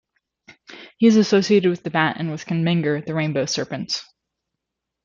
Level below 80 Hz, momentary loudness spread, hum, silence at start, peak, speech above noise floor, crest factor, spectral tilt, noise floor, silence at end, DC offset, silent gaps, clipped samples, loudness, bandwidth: -64 dBFS; 10 LU; none; 0.7 s; -4 dBFS; 62 dB; 18 dB; -5.5 dB/octave; -82 dBFS; 1.05 s; under 0.1%; none; under 0.1%; -20 LUFS; 7.6 kHz